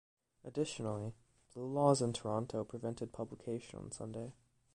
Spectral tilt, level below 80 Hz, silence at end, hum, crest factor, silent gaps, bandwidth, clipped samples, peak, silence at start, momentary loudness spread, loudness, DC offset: -6 dB/octave; -68 dBFS; 0.4 s; none; 22 dB; none; 11 kHz; under 0.1%; -16 dBFS; 0.45 s; 16 LU; -39 LUFS; under 0.1%